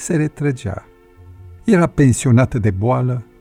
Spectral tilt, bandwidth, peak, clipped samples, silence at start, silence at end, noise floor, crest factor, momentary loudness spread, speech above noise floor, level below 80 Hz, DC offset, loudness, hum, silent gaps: -7 dB/octave; 13 kHz; -2 dBFS; under 0.1%; 0 s; 0.2 s; -42 dBFS; 14 dB; 13 LU; 27 dB; -40 dBFS; under 0.1%; -16 LUFS; none; none